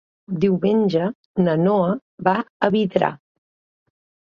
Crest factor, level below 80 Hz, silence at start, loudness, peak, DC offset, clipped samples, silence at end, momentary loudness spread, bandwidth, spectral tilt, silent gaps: 18 dB; -60 dBFS; 0.3 s; -20 LUFS; -2 dBFS; under 0.1%; under 0.1%; 1.05 s; 6 LU; 6.6 kHz; -9 dB/octave; 1.15-1.34 s, 2.02-2.18 s, 2.50-2.60 s